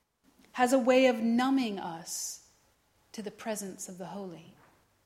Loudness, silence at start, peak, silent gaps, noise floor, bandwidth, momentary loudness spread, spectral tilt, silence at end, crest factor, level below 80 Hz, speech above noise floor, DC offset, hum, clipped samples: -29 LUFS; 0.55 s; -12 dBFS; none; -69 dBFS; 16 kHz; 20 LU; -3.5 dB/octave; 0.55 s; 20 dB; -76 dBFS; 39 dB; under 0.1%; none; under 0.1%